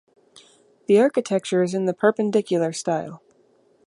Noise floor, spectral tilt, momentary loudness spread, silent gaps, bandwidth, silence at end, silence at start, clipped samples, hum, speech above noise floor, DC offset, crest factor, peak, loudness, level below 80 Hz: -60 dBFS; -5.5 dB/octave; 9 LU; none; 11.5 kHz; 0.7 s; 0.9 s; under 0.1%; none; 39 dB; under 0.1%; 18 dB; -4 dBFS; -21 LUFS; -74 dBFS